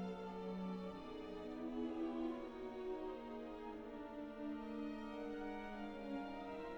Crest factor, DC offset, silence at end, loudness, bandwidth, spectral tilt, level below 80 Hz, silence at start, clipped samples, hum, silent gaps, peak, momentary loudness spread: 14 dB; under 0.1%; 0 s; -48 LUFS; 19 kHz; -7.5 dB/octave; -64 dBFS; 0 s; under 0.1%; none; none; -34 dBFS; 6 LU